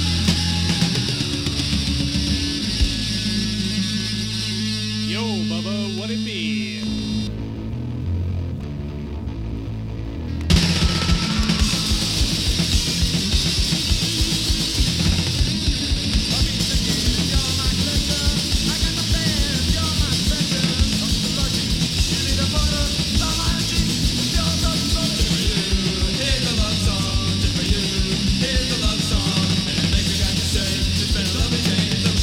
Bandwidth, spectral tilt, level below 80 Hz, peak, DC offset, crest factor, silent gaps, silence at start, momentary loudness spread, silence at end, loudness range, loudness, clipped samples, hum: 17 kHz; -4 dB/octave; -26 dBFS; -4 dBFS; 0.2%; 18 dB; none; 0 s; 6 LU; 0 s; 5 LU; -20 LUFS; under 0.1%; none